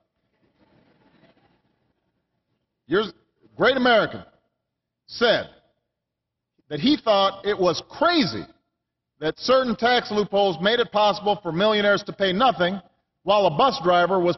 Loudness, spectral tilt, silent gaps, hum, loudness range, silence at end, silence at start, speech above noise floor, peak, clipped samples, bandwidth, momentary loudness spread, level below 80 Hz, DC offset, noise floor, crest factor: -21 LUFS; -5.5 dB/octave; none; none; 5 LU; 0 s; 2.9 s; 62 dB; -6 dBFS; under 0.1%; 6.2 kHz; 11 LU; -58 dBFS; under 0.1%; -83 dBFS; 16 dB